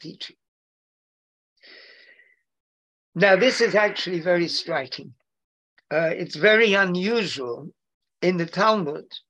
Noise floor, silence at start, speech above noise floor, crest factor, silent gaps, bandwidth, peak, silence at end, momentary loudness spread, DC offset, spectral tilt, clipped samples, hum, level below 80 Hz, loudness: -58 dBFS; 0 s; 36 dB; 20 dB; 0.48-1.56 s, 2.60-3.12 s, 5.44-5.76 s, 7.94-8.01 s; 10.5 kHz; -4 dBFS; 0.1 s; 19 LU; under 0.1%; -4.5 dB/octave; under 0.1%; none; -74 dBFS; -21 LUFS